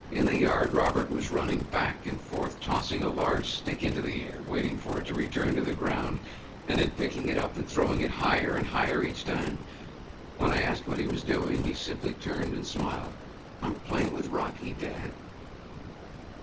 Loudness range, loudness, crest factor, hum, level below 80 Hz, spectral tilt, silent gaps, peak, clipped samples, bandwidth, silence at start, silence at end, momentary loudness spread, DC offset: 4 LU; -30 LUFS; 18 dB; none; -44 dBFS; -5.5 dB/octave; none; -12 dBFS; under 0.1%; 8 kHz; 0 s; 0 s; 17 LU; under 0.1%